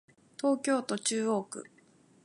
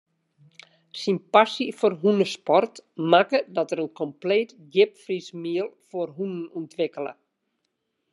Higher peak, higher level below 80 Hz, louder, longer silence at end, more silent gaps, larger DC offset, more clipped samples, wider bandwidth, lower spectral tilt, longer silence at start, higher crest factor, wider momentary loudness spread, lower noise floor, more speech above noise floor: second, -16 dBFS vs -2 dBFS; about the same, -86 dBFS vs -86 dBFS; second, -31 LUFS vs -24 LUFS; second, 0.6 s vs 1 s; neither; neither; neither; about the same, 11.5 kHz vs 11.5 kHz; second, -3.5 dB/octave vs -5.5 dB/octave; second, 0.45 s vs 0.95 s; second, 16 dB vs 22 dB; about the same, 15 LU vs 13 LU; second, -63 dBFS vs -77 dBFS; second, 32 dB vs 53 dB